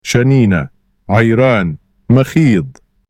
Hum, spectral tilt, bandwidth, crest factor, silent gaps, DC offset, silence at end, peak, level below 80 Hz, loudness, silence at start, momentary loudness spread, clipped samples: none; -7 dB/octave; 15 kHz; 12 dB; none; under 0.1%; 0.4 s; 0 dBFS; -42 dBFS; -12 LUFS; 0.05 s; 15 LU; under 0.1%